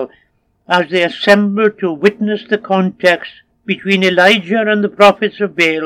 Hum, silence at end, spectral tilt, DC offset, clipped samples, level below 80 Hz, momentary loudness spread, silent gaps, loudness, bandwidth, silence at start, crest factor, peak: none; 0 s; -5.5 dB/octave; under 0.1%; 0.3%; -60 dBFS; 10 LU; none; -13 LUFS; 15.5 kHz; 0 s; 14 dB; 0 dBFS